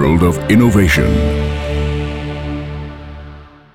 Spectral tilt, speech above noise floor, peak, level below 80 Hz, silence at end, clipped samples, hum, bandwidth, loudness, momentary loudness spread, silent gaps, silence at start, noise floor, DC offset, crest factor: -6.5 dB/octave; 24 dB; -2 dBFS; -22 dBFS; 0.25 s; under 0.1%; none; 16.5 kHz; -15 LUFS; 21 LU; none; 0 s; -36 dBFS; under 0.1%; 14 dB